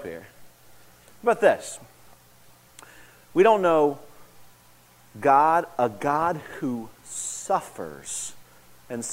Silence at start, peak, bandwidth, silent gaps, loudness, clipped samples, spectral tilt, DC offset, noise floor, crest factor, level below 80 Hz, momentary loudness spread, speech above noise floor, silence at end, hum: 0 s; -4 dBFS; 16 kHz; none; -24 LUFS; under 0.1%; -4 dB/octave; under 0.1%; -55 dBFS; 22 dB; -64 dBFS; 19 LU; 32 dB; 0 s; 60 Hz at -60 dBFS